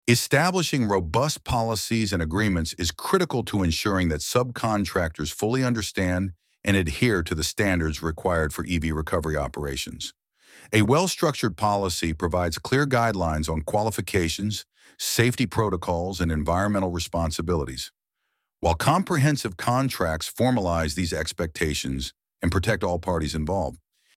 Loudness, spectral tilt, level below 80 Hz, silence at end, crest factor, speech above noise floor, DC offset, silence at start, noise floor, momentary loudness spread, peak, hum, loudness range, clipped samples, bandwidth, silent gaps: -25 LUFS; -5 dB/octave; -40 dBFS; 0.4 s; 18 dB; 55 dB; under 0.1%; 0.05 s; -79 dBFS; 7 LU; -6 dBFS; none; 2 LU; under 0.1%; 16.5 kHz; none